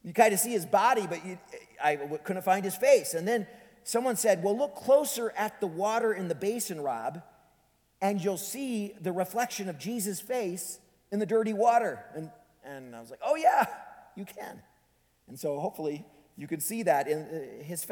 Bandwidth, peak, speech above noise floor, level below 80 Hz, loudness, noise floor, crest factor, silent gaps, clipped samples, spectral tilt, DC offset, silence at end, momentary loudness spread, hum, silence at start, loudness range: 19.5 kHz; -6 dBFS; 40 dB; -76 dBFS; -29 LUFS; -69 dBFS; 24 dB; none; under 0.1%; -4 dB/octave; under 0.1%; 0 s; 20 LU; none; 0.05 s; 6 LU